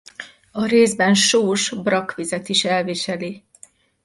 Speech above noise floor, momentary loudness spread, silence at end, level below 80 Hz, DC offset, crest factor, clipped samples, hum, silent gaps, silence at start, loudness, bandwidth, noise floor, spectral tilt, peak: 31 dB; 17 LU; 0.65 s; -62 dBFS; under 0.1%; 16 dB; under 0.1%; none; none; 0.2 s; -18 LUFS; 11.5 kHz; -50 dBFS; -3 dB/octave; -4 dBFS